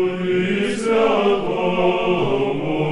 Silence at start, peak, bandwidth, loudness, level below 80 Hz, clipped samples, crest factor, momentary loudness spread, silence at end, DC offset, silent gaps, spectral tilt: 0 s; -6 dBFS; 11.5 kHz; -19 LUFS; -44 dBFS; under 0.1%; 14 dB; 4 LU; 0 s; under 0.1%; none; -6 dB/octave